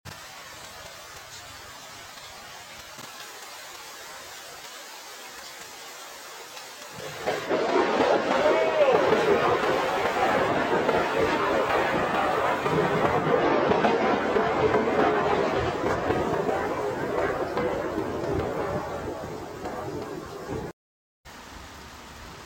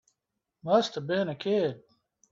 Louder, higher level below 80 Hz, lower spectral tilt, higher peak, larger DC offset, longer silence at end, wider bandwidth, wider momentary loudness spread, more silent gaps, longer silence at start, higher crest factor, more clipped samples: first, -25 LUFS vs -28 LUFS; first, -52 dBFS vs -74 dBFS; about the same, -5 dB/octave vs -6 dB/octave; about the same, -8 dBFS vs -10 dBFS; neither; second, 0 s vs 0.55 s; first, 17 kHz vs 7.6 kHz; first, 18 LU vs 13 LU; first, 20.73-21.24 s vs none; second, 0.05 s vs 0.65 s; about the same, 18 dB vs 20 dB; neither